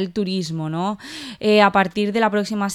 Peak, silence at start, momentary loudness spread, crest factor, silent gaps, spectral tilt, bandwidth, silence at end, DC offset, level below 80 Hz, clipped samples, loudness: -2 dBFS; 0 s; 11 LU; 18 dB; none; -5.5 dB/octave; 13 kHz; 0 s; under 0.1%; -58 dBFS; under 0.1%; -19 LUFS